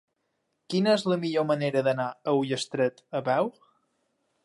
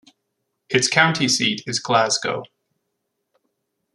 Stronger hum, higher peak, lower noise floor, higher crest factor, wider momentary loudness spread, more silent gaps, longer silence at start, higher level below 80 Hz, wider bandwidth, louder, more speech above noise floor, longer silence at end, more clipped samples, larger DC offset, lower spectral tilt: neither; second, -12 dBFS vs -2 dBFS; about the same, -77 dBFS vs -76 dBFS; second, 16 dB vs 22 dB; second, 6 LU vs 9 LU; neither; about the same, 0.7 s vs 0.7 s; second, -78 dBFS vs -64 dBFS; about the same, 11.5 kHz vs 12.5 kHz; second, -27 LUFS vs -19 LUFS; second, 51 dB vs 57 dB; second, 0.95 s vs 1.5 s; neither; neither; first, -5.5 dB/octave vs -2.5 dB/octave